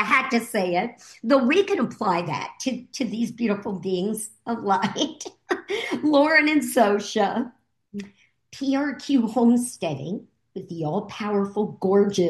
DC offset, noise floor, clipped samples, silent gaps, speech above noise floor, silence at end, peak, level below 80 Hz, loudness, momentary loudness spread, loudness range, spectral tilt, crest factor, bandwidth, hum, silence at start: under 0.1%; -51 dBFS; under 0.1%; none; 28 dB; 0 s; -6 dBFS; -72 dBFS; -23 LUFS; 14 LU; 4 LU; -5 dB/octave; 18 dB; 12.5 kHz; none; 0 s